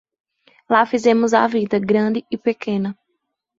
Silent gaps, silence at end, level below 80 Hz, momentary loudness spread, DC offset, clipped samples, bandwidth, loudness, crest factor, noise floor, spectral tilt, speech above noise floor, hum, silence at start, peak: none; 0.65 s; -62 dBFS; 8 LU; under 0.1%; under 0.1%; 7.8 kHz; -18 LUFS; 18 dB; -74 dBFS; -6 dB/octave; 57 dB; none; 0.7 s; -2 dBFS